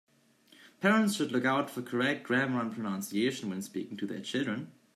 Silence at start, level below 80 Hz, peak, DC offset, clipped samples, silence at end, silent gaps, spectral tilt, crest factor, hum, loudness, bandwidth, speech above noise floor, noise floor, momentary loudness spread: 0.6 s; -80 dBFS; -12 dBFS; under 0.1%; under 0.1%; 0.25 s; none; -5 dB/octave; 20 dB; none; -31 LUFS; 15 kHz; 32 dB; -63 dBFS; 10 LU